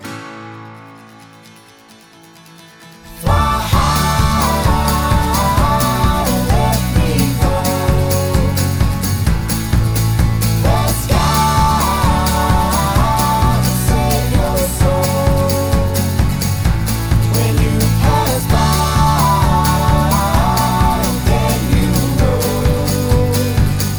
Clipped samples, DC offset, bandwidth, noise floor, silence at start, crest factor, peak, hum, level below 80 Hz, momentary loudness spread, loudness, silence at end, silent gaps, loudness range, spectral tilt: under 0.1%; 0.9%; over 20 kHz; -42 dBFS; 0 s; 12 dB; -2 dBFS; none; -20 dBFS; 3 LU; -14 LUFS; 0 s; none; 2 LU; -5.5 dB/octave